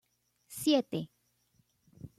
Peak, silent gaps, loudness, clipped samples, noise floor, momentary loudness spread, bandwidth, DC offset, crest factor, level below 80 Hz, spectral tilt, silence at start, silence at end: -16 dBFS; none; -31 LUFS; under 0.1%; -73 dBFS; 20 LU; 14 kHz; under 0.1%; 20 dB; -72 dBFS; -4.5 dB/octave; 0.5 s; 0.1 s